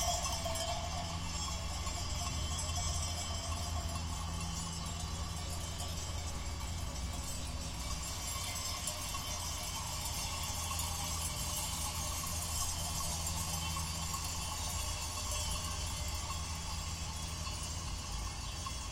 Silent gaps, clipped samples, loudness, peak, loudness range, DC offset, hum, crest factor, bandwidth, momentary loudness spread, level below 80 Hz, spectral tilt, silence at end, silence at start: none; under 0.1%; -38 LUFS; -22 dBFS; 4 LU; under 0.1%; none; 18 dB; 16.5 kHz; 5 LU; -46 dBFS; -2.5 dB/octave; 0 s; 0 s